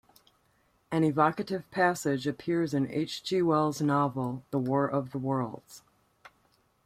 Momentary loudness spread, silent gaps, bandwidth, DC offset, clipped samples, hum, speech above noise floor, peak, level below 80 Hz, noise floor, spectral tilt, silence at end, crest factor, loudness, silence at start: 8 LU; none; 15.5 kHz; under 0.1%; under 0.1%; none; 41 dB; -10 dBFS; -68 dBFS; -69 dBFS; -6.5 dB/octave; 1.05 s; 20 dB; -29 LUFS; 0.9 s